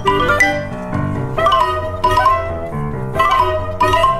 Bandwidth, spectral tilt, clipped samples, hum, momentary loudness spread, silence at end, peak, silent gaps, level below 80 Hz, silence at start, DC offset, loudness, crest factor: 15 kHz; -5 dB/octave; under 0.1%; none; 10 LU; 0 s; 0 dBFS; none; -30 dBFS; 0 s; under 0.1%; -16 LUFS; 14 dB